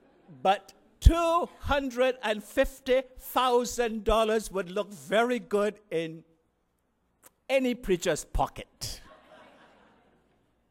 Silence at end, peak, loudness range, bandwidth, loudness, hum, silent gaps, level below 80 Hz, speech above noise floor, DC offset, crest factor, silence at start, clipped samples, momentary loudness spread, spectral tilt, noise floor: 1.7 s; -4 dBFS; 5 LU; 16 kHz; -28 LUFS; none; none; -36 dBFS; 46 dB; under 0.1%; 26 dB; 0.3 s; under 0.1%; 9 LU; -5 dB/octave; -74 dBFS